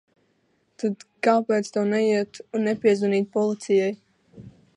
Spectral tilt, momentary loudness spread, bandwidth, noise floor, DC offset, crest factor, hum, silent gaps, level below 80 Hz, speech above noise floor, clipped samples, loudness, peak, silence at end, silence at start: -6 dB/octave; 8 LU; 11 kHz; -68 dBFS; under 0.1%; 18 dB; none; none; -70 dBFS; 45 dB; under 0.1%; -23 LUFS; -6 dBFS; 0.3 s; 0.8 s